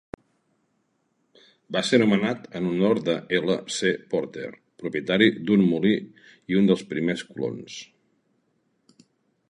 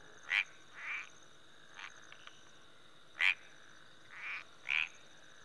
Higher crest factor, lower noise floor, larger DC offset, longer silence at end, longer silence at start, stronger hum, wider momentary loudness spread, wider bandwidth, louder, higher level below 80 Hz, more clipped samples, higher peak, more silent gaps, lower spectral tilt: second, 20 dB vs 28 dB; first, -71 dBFS vs -62 dBFS; second, under 0.1% vs 0.1%; first, 1.65 s vs 0 s; first, 1.7 s vs 0 s; neither; second, 17 LU vs 26 LU; about the same, 10.5 kHz vs 11 kHz; first, -24 LUFS vs -36 LUFS; first, -64 dBFS vs -86 dBFS; neither; first, -4 dBFS vs -14 dBFS; neither; first, -5.5 dB/octave vs 0 dB/octave